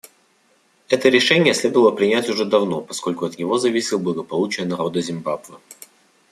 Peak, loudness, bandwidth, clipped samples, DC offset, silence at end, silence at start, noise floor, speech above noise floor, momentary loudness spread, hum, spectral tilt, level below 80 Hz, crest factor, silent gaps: -2 dBFS; -19 LUFS; 14.5 kHz; under 0.1%; under 0.1%; 0.6 s; 0.9 s; -60 dBFS; 41 dB; 10 LU; none; -4 dB/octave; -64 dBFS; 18 dB; none